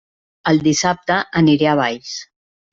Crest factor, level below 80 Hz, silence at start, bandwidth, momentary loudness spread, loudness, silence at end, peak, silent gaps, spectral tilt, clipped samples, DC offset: 16 dB; -52 dBFS; 0.45 s; 7.8 kHz; 14 LU; -16 LUFS; 0.5 s; -2 dBFS; none; -4.5 dB/octave; under 0.1%; under 0.1%